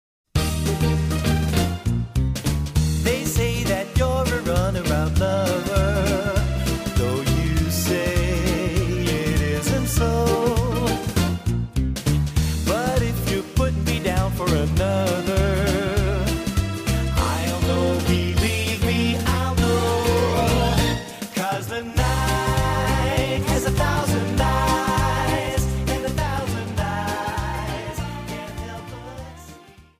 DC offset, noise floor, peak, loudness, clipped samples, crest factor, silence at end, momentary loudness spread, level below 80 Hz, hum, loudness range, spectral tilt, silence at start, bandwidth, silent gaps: under 0.1%; -45 dBFS; -6 dBFS; -22 LUFS; under 0.1%; 16 dB; 0.2 s; 6 LU; -28 dBFS; none; 2 LU; -5.5 dB/octave; 0.35 s; 15.5 kHz; none